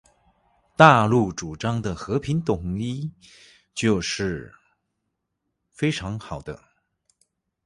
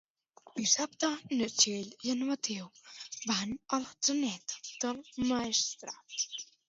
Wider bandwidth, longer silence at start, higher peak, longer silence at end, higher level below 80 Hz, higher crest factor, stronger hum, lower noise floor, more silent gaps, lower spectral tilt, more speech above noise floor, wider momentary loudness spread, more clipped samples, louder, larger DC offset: first, 11.5 kHz vs 7.8 kHz; first, 0.8 s vs 0.45 s; first, 0 dBFS vs -12 dBFS; first, 1.1 s vs 0.25 s; first, -48 dBFS vs -70 dBFS; about the same, 24 dB vs 24 dB; neither; first, -79 dBFS vs -61 dBFS; neither; first, -5.5 dB/octave vs -1.5 dB/octave; first, 56 dB vs 27 dB; first, 21 LU vs 13 LU; neither; first, -22 LUFS vs -32 LUFS; neither